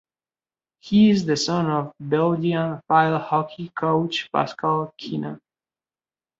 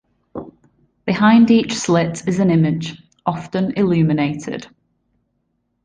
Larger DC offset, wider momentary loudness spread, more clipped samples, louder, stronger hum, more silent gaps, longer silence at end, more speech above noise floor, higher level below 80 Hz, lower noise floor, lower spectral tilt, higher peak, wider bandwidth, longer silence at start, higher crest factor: neither; second, 12 LU vs 19 LU; neither; second, -22 LUFS vs -17 LUFS; neither; neither; second, 1.05 s vs 1.2 s; first, over 69 dB vs 53 dB; second, -62 dBFS vs -54 dBFS; first, under -90 dBFS vs -69 dBFS; about the same, -6 dB/octave vs -6.5 dB/octave; about the same, -4 dBFS vs -2 dBFS; second, 7.8 kHz vs 9.6 kHz; first, 0.85 s vs 0.35 s; about the same, 18 dB vs 16 dB